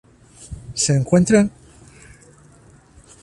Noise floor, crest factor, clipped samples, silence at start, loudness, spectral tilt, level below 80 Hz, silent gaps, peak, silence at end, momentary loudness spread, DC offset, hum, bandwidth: -49 dBFS; 18 dB; under 0.1%; 0.4 s; -17 LUFS; -5.5 dB/octave; -46 dBFS; none; -4 dBFS; 1.75 s; 21 LU; under 0.1%; none; 11.5 kHz